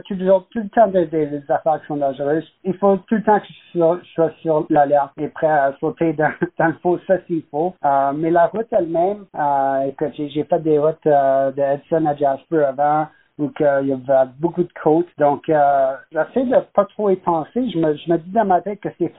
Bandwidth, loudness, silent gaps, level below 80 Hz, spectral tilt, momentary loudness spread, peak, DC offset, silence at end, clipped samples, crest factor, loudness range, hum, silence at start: 4 kHz; -19 LUFS; none; -58 dBFS; -6.5 dB/octave; 6 LU; -2 dBFS; under 0.1%; 0.05 s; under 0.1%; 16 dB; 1 LU; none; 0.05 s